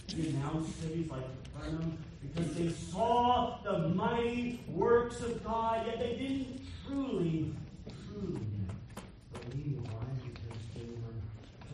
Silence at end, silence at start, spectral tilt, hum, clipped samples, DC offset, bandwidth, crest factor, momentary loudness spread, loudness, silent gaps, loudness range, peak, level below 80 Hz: 0 s; 0 s; -7 dB/octave; none; under 0.1%; under 0.1%; 11.5 kHz; 20 dB; 15 LU; -36 LUFS; none; 10 LU; -16 dBFS; -54 dBFS